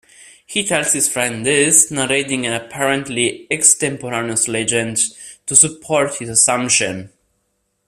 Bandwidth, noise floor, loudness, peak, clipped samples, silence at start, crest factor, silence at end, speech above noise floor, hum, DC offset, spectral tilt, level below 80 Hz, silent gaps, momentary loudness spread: 16 kHz; -68 dBFS; -15 LUFS; 0 dBFS; under 0.1%; 0.5 s; 18 dB; 0.8 s; 51 dB; none; under 0.1%; -2 dB/octave; -56 dBFS; none; 10 LU